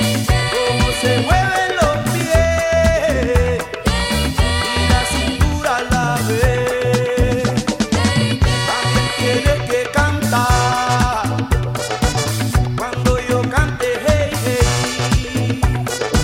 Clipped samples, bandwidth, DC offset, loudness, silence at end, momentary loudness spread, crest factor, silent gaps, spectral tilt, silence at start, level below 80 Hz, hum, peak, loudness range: under 0.1%; 16.5 kHz; under 0.1%; -17 LUFS; 0 s; 4 LU; 14 dB; none; -4.5 dB/octave; 0 s; -24 dBFS; none; -2 dBFS; 2 LU